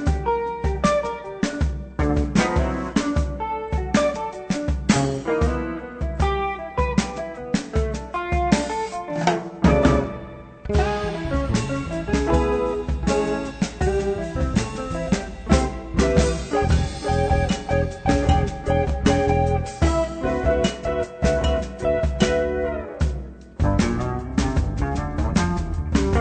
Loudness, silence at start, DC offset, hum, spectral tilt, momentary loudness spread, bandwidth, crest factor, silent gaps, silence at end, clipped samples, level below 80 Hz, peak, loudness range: -23 LUFS; 0 s; under 0.1%; none; -6 dB/octave; 7 LU; 9.2 kHz; 20 dB; none; 0 s; under 0.1%; -28 dBFS; -2 dBFS; 3 LU